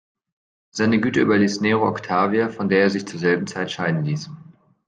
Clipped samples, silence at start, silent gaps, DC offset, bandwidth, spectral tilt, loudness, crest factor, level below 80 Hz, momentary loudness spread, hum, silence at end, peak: under 0.1%; 0.75 s; none; under 0.1%; 9.4 kHz; -6 dB/octave; -20 LUFS; 16 dB; -62 dBFS; 8 LU; none; 0.45 s; -4 dBFS